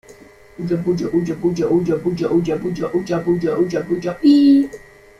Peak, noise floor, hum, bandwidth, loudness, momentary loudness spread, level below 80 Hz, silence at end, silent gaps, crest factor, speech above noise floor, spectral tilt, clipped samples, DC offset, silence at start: -4 dBFS; -44 dBFS; none; 11 kHz; -18 LUFS; 10 LU; -50 dBFS; 0.4 s; none; 14 dB; 27 dB; -7.5 dB/octave; under 0.1%; under 0.1%; 0.1 s